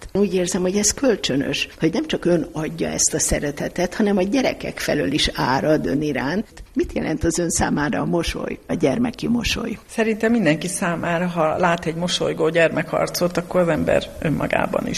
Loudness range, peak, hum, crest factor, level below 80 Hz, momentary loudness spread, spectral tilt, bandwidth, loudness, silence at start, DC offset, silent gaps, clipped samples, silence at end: 2 LU; -4 dBFS; none; 16 dB; -40 dBFS; 6 LU; -4 dB/octave; 14 kHz; -21 LUFS; 0 s; under 0.1%; none; under 0.1%; 0 s